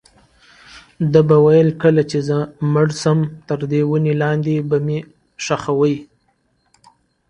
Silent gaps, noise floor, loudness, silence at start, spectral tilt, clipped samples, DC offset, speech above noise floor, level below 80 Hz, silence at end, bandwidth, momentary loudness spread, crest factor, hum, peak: none; -63 dBFS; -17 LUFS; 0.75 s; -7.5 dB/octave; under 0.1%; under 0.1%; 48 dB; -54 dBFS; 1.25 s; 10.5 kHz; 11 LU; 18 dB; none; 0 dBFS